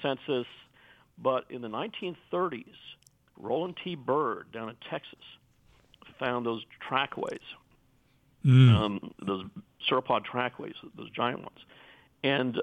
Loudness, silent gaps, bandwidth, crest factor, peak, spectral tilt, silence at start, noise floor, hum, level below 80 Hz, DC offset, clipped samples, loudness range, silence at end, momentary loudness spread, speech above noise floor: -30 LUFS; none; 4.8 kHz; 20 dB; -10 dBFS; -8 dB/octave; 0 s; -66 dBFS; none; -62 dBFS; under 0.1%; under 0.1%; 9 LU; 0 s; 18 LU; 37 dB